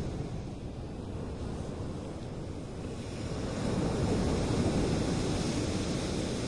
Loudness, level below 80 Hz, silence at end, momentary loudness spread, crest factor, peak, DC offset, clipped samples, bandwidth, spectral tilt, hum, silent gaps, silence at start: -34 LUFS; -44 dBFS; 0 s; 10 LU; 16 dB; -18 dBFS; under 0.1%; under 0.1%; 11.5 kHz; -6 dB/octave; none; none; 0 s